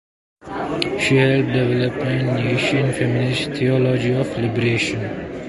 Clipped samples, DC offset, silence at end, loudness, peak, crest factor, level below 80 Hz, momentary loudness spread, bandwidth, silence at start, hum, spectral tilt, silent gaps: under 0.1%; under 0.1%; 0 s; -19 LUFS; -2 dBFS; 18 dB; -48 dBFS; 7 LU; 11.5 kHz; 0.45 s; none; -6 dB/octave; none